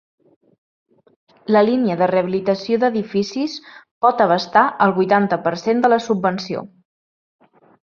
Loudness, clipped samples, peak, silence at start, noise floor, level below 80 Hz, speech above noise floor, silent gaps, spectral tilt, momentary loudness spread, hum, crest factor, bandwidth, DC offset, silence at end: -18 LUFS; under 0.1%; -2 dBFS; 1.5 s; under -90 dBFS; -64 dBFS; over 73 dB; 3.91-4.01 s; -6.5 dB/octave; 11 LU; none; 18 dB; 7.2 kHz; under 0.1%; 1.15 s